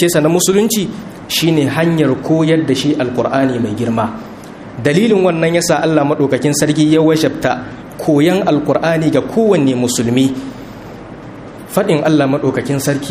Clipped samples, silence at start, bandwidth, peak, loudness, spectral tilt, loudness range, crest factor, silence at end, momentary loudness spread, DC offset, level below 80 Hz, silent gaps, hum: under 0.1%; 0 s; 15.5 kHz; 0 dBFS; -13 LUFS; -5 dB/octave; 3 LU; 14 dB; 0 s; 17 LU; under 0.1%; -46 dBFS; none; none